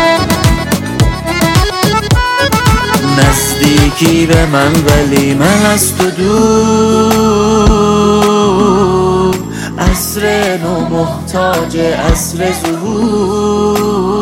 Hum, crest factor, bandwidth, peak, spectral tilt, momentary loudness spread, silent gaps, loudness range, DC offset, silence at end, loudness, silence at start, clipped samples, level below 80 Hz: none; 10 dB; 17 kHz; 0 dBFS; -5 dB/octave; 5 LU; none; 4 LU; under 0.1%; 0 s; -10 LUFS; 0 s; under 0.1%; -22 dBFS